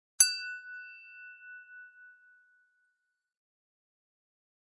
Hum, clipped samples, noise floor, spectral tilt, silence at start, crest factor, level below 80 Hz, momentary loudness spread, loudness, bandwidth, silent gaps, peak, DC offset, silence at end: none; under 0.1%; -82 dBFS; 5.5 dB/octave; 0.2 s; 32 dB; under -90 dBFS; 27 LU; -27 LUFS; 11.5 kHz; none; -6 dBFS; under 0.1%; 2.9 s